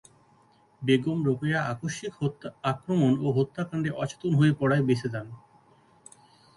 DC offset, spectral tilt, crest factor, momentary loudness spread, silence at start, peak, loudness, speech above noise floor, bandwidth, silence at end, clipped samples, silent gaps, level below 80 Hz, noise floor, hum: under 0.1%; -7 dB/octave; 18 dB; 10 LU; 0.8 s; -10 dBFS; -27 LUFS; 35 dB; 11.5 kHz; 1.2 s; under 0.1%; none; -62 dBFS; -61 dBFS; none